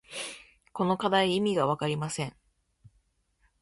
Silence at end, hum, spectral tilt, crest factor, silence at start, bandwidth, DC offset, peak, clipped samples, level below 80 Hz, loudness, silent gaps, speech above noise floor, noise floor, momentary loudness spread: 1.3 s; none; -5 dB/octave; 18 dB; 0.1 s; 11.5 kHz; under 0.1%; -12 dBFS; under 0.1%; -64 dBFS; -28 LUFS; none; 43 dB; -71 dBFS; 14 LU